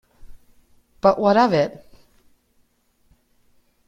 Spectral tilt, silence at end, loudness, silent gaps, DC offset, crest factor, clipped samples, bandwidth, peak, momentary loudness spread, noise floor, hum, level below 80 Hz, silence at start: -7 dB/octave; 2.2 s; -18 LUFS; none; under 0.1%; 20 dB; under 0.1%; 7.6 kHz; -4 dBFS; 6 LU; -64 dBFS; none; -54 dBFS; 0.25 s